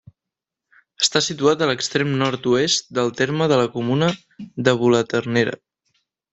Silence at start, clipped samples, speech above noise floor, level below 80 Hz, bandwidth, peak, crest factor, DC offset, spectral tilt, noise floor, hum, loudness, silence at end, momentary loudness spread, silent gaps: 1 s; under 0.1%; 66 dB; -60 dBFS; 8.4 kHz; -2 dBFS; 20 dB; under 0.1%; -4 dB/octave; -86 dBFS; none; -19 LUFS; 0.8 s; 5 LU; none